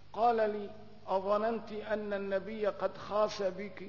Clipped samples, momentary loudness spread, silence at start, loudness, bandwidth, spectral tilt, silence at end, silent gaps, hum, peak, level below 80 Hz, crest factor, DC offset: under 0.1%; 9 LU; 0.15 s; -34 LUFS; 6 kHz; -3.5 dB/octave; 0 s; none; 50 Hz at -60 dBFS; -18 dBFS; -68 dBFS; 16 dB; 0.3%